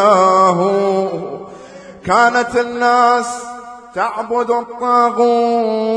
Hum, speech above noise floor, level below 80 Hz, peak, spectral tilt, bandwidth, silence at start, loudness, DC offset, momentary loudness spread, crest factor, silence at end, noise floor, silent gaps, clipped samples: none; 21 dB; -54 dBFS; 0 dBFS; -5 dB/octave; 10.5 kHz; 0 s; -14 LUFS; under 0.1%; 17 LU; 14 dB; 0 s; -36 dBFS; none; under 0.1%